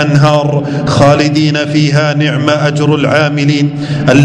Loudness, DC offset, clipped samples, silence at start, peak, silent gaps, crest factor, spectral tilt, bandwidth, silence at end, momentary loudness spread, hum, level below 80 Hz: -10 LUFS; under 0.1%; 2%; 0 s; 0 dBFS; none; 10 dB; -6.5 dB/octave; 10 kHz; 0 s; 5 LU; none; -42 dBFS